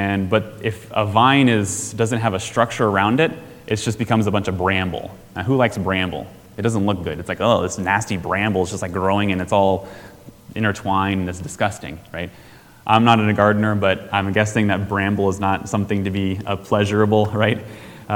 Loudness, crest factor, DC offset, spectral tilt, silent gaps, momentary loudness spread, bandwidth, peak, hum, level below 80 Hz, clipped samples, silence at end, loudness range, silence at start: -19 LUFS; 20 dB; under 0.1%; -5.5 dB/octave; none; 12 LU; 18 kHz; 0 dBFS; none; -50 dBFS; under 0.1%; 0 s; 3 LU; 0 s